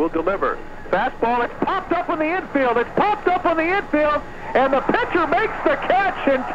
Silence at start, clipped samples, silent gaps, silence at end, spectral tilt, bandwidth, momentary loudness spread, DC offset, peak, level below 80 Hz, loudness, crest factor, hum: 0 s; under 0.1%; none; 0 s; -6.5 dB/octave; 9 kHz; 5 LU; under 0.1%; -6 dBFS; -40 dBFS; -20 LUFS; 14 dB; none